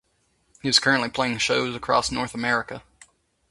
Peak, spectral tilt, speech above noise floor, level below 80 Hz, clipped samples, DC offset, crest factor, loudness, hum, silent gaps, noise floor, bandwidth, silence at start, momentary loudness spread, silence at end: -2 dBFS; -3 dB/octave; 44 dB; -54 dBFS; under 0.1%; under 0.1%; 22 dB; -22 LUFS; none; none; -68 dBFS; 11.5 kHz; 0.65 s; 11 LU; 0.7 s